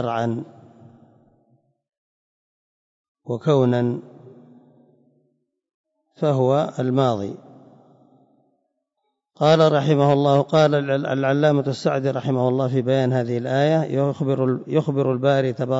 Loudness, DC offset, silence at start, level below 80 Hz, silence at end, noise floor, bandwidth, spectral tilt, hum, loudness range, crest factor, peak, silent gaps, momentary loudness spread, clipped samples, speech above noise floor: -20 LUFS; under 0.1%; 0 s; -68 dBFS; 0 s; -76 dBFS; 7.8 kHz; -7.5 dB/octave; none; 7 LU; 16 dB; -6 dBFS; 1.98-3.15 s, 5.74-5.84 s; 9 LU; under 0.1%; 57 dB